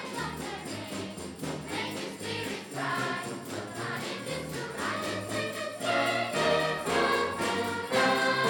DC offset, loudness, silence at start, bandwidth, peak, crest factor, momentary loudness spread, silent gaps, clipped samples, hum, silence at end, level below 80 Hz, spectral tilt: under 0.1%; -31 LUFS; 0 s; over 20 kHz; -14 dBFS; 18 dB; 11 LU; none; under 0.1%; none; 0 s; -62 dBFS; -3.5 dB/octave